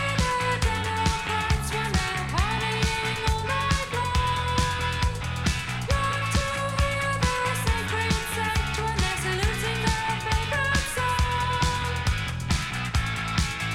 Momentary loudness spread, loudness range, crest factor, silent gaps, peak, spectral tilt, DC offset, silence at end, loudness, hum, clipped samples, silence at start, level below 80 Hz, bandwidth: 2 LU; 1 LU; 16 dB; none; -8 dBFS; -4 dB/octave; under 0.1%; 0 s; -26 LUFS; none; under 0.1%; 0 s; -32 dBFS; 16.5 kHz